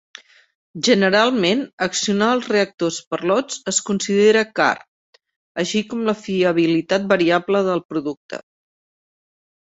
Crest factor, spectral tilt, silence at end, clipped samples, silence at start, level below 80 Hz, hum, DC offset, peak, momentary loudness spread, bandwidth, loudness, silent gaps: 18 dB; -4 dB/octave; 1.35 s; under 0.1%; 0.75 s; -62 dBFS; none; under 0.1%; -2 dBFS; 11 LU; 8.2 kHz; -19 LUFS; 1.73-1.78 s, 2.74-2.78 s, 3.07-3.11 s, 4.88-5.13 s, 5.36-5.55 s, 7.85-7.89 s, 8.17-8.29 s